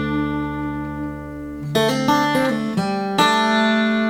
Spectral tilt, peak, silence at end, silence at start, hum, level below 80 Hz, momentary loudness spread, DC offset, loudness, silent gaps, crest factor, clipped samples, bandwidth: -5 dB/octave; -4 dBFS; 0 s; 0 s; none; -42 dBFS; 13 LU; under 0.1%; -19 LUFS; none; 16 dB; under 0.1%; 18 kHz